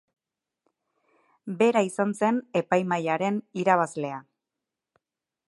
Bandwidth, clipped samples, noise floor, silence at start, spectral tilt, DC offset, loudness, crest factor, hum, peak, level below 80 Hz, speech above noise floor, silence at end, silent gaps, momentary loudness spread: 11.5 kHz; under 0.1%; -87 dBFS; 1.45 s; -6 dB/octave; under 0.1%; -25 LUFS; 22 dB; none; -6 dBFS; -78 dBFS; 62 dB; 1.25 s; none; 12 LU